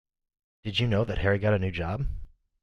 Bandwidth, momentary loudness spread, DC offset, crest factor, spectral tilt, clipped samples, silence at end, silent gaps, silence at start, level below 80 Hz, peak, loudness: 7.6 kHz; 12 LU; under 0.1%; 18 dB; -7 dB/octave; under 0.1%; 0.35 s; none; 0.65 s; -40 dBFS; -12 dBFS; -28 LUFS